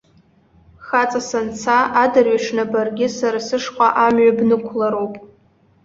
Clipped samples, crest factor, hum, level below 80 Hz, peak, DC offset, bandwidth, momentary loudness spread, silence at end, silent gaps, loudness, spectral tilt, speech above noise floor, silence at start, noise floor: under 0.1%; 16 dB; none; -58 dBFS; -2 dBFS; under 0.1%; 7.6 kHz; 9 LU; 0.6 s; none; -17 LUFS; -4.5 dB/octave; 38 dB; 0.8 s; -55 dBFS